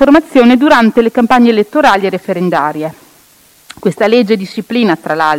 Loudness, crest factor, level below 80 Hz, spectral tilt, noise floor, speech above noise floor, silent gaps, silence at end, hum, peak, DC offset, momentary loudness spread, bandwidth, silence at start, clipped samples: -10 LUFS; 10 dB; -44 dBFS; -6 dB/octave; -45 dBFS; 36 dB; none; 0 s; none; 0 dBFS; under 0.1%; 10 LU; 16 kHz; 0 s; 1%